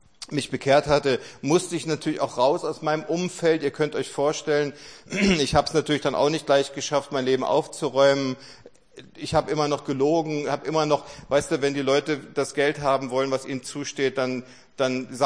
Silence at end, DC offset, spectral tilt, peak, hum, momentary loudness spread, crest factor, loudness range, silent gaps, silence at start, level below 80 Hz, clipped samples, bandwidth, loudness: 0 s; 0.1%; -4.5 dB/octave; -4 dBFS; none; 8 LU; 20 dB; 2 LU; none; 0.2 s; -52 dBFS; under 0.1%; 10.5 kHz; -24 LUFS